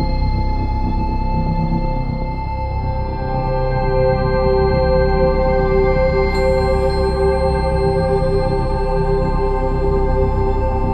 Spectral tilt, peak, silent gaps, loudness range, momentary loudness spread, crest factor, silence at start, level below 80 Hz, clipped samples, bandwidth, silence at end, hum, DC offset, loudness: -8.5 dB/octave; -4 dBFS; none; 5 LU; 6 LU; 12 dB; 0 s; -20 dBFS; under 0.1%; 9 kHz; 0 s; none; under 0.1%; -18 LUFS